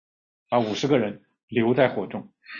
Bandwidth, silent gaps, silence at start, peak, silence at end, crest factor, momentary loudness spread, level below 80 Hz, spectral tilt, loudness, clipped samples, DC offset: 7.2 kHz; 1.43-1.48 s; 0.5 s; -6 dBFS; 0 s; 20 dB; 14 LU; -66 dBFS; -6 dB/octave; -24 LUFS; under 0.1%; under 0.1%